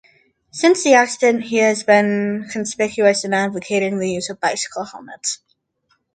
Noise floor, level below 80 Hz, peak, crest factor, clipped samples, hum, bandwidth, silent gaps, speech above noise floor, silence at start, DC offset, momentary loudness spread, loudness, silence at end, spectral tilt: -66 dBFS; -64 dBFS; 0 dBFS; 18 dB; under 0.1%; none; 9.6 kHz; none; 48 dB; 0.55 s; under 0.1%; 12 LU; -18 LUFS; 0.8 s; -3.5 dB/octave